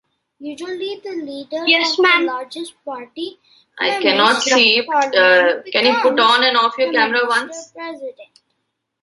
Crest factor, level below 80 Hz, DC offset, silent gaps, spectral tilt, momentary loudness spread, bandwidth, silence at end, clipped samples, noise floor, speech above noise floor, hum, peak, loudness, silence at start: 18 dB; -68 dBFS; under 0.1%; none; -1.5 dB/octave; 18 LU; 11.5 kHz; 0.8 s; under 0.1%; -74 dBFS; 56 dB; none; 0 dBFS; -14 LUFS; 0.4 s